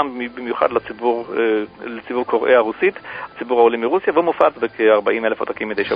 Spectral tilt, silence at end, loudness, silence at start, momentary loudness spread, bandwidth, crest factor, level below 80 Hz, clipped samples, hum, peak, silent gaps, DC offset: -7.5 dB/octave; 0 s; -18 LUFS; 0 s; 11 LU; 5.2 kHz; 18 dB; -58 dBFS; under 0.1%; none; 0 dBFS; none; under 0.1%